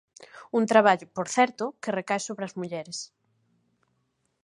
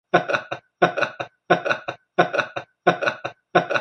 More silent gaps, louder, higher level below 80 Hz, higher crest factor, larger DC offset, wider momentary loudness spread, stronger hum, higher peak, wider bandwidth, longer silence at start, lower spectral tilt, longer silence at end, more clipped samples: neither; second, -26 LUFS vs -23 LUFS; second, -78 dBFS vs -66 dBFS; about the same, 24 dB vs 22 dB; neither; first, 15 LU vs 9 LU; neither; second, -4 dBFS vs 0 dBFS; first, 11.5 kHz vs 9 kHz; about the same, 0.2 s vs 0.15 s; second, -4 dB/octave vs -5.5 dB/octave; first, 1.4 s vs 0 s; neither